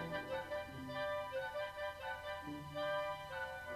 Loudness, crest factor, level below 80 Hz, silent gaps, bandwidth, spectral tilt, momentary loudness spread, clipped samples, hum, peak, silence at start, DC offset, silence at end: -43 LUFS; 14 dB; -66 dBFS; none; 14 kHz; -5 dB/octave; 5 LU; under 0.1%; none; -30 dBFS; 0 s; under 0.1%; 0 s